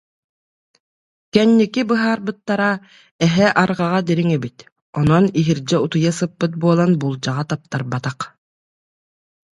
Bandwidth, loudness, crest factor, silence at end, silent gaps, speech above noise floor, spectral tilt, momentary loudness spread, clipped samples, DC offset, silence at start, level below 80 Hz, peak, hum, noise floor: 11 kHz; -18 LUFS; 18 dB; 1.25 s; 3.11-3.19 s, 4.72-4.76 s, 4.82-4.93 s; over 73 dB; -6.5 dB/octave; 10 LU; under 0.1%; under 0.1%; 1.35 s; -54 dBFS; 0 dBFS; none; under -90 dBFS